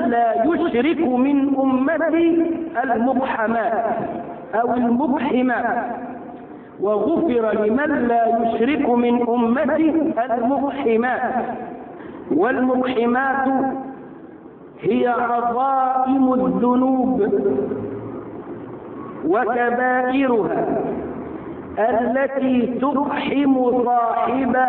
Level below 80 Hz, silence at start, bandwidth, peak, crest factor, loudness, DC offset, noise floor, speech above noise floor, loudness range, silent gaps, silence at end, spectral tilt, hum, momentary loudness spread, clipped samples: -54 dBFS; 0 s; 4.1 kHz; -6 dBFS; 12 dB; -19 LUFS; under 0.1%; -40 dBFS; 22 dB; 3 LU; none; 0 s; -10.5 dB/octave; none; 14 LU; under 0.1%